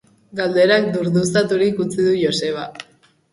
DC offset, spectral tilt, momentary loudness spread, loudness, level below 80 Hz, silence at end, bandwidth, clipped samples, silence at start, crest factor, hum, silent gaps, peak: under 0.1%; -5 dB/octave; 14 LU; -18 LUFS; -58 dBFS; 0.5 s; 11.5 kHz; under 0.1%; 0.35 s; 16 dB; none; none; -2 dBFS